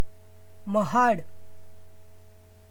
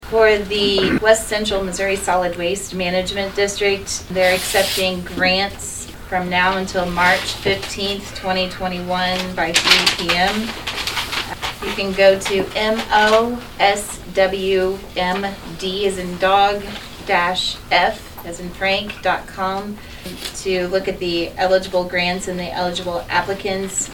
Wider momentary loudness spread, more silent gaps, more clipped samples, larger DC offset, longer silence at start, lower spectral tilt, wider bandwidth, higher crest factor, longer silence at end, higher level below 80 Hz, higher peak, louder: first, 17 LU vs 10 LU; neither; neither; neither; about the same, 0 s vs 0 s; first, -6 dB/octave vs -3 dB/octave; about the same, 19.5 kHz vs 19 kHz; about the same, 18 dB vs 20 dB; about the same, 0 s vs 0 s; second, -60 dBFS vs -40 dBFS; second, -10 dBFS vs 0 dBFS; second, -25 LUFS vs -18 LUFS